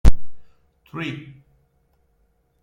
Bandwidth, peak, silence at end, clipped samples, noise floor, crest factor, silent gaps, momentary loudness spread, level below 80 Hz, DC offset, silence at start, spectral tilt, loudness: 8.8 kHz; 0 dBFS; 1.5 s; under 0.1%; -64 dBFS; 18 dB; none; 21 LU; -24 dBFS; under 0.1%; 0.05 s; -6.5 dB/octave; -28 LUFS